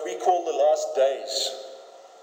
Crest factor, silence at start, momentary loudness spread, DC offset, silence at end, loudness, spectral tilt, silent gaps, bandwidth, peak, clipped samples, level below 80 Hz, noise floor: 16 dB; 0 s; 11 LU; under 0.1%; 0.15 s; -24 LUFS; 0 dB/octave; none; 16.5 kHz; -8 dBFS; under 0.1%; under -90 dBFS; -46 dBFS